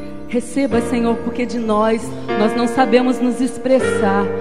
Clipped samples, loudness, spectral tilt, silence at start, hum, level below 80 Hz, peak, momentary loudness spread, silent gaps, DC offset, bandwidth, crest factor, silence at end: under 0.1%; -17 LUFS; -5.5 dB/octave; 0 s; none; -46 dBFS; 0 dBFS; 8 LU; none; 3%; 12.5 kHz; 16 dB; 0 s